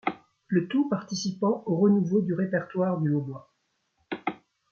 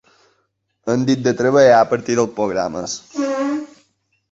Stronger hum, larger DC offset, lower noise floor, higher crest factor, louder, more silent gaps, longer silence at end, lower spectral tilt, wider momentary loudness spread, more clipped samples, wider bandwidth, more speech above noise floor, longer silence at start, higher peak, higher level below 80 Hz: neither; neither; first, -75 dBFS vs -68 dBFS; about the same, 16 dB vs 18 dB; second, -27 LUFS vs -17 LUFS; neither; second, 0.35 s vs 0.65 s; first, -7 dB/octave vs -5 dB/octave; about the same, 13 LU vs 14 LU; neither; second, 7.2 kHz vs 8 kHz; about the same, 49 dB vs 52 dB; second, 0.05 s vs 0.85 s; second, -12 dBFS vs 0 dBFS; second, -72 dBFS vs -56 dBFS